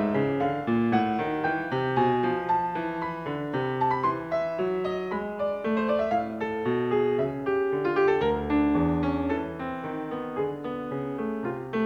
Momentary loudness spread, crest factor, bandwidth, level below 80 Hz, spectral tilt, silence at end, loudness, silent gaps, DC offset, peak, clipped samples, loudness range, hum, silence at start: 8 LU; 16 dB; 7 kHz; -50 dBFS; -8.5 dB/octave; 0 s; -27 LUFS; none; under 0.1%; -10 dBFS; under 0.1%; 3 LU; none; 0 s